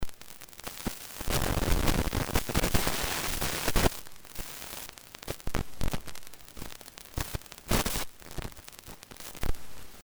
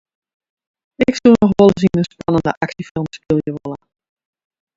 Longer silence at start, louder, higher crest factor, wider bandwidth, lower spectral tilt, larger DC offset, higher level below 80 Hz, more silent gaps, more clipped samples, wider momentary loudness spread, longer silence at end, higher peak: second, 0 s vs 1 s; second, -32 LUFS vs -16 LUFS; about the same, 22 dB vs 18 dB; first, over 20 kHz vs 7.8 kHz; second, -3.5 dB/octave vs -7.5 dB/octave; neither; first, -36 dBFS vs -46 dBFS; second, none vs 2.57-2.61 s, 2.91-2.95 s; neither; first, 17 LU vs 14 LU; second, 0.05 s vs 1 s; second, -10 dBFS vs 0 dBFS